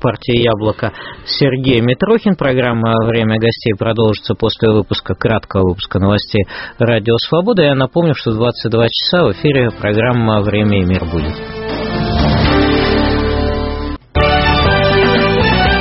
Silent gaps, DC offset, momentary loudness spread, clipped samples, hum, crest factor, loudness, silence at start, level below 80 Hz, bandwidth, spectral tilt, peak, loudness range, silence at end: none; under 0.1%; 8 LU; under 0.1%; none; 14 dB; -14 LUFS; 0 s; -26 dBFS; 5.8 kHz; -4.5 dB/octave; 0 dBFS; 2 LU; 0 s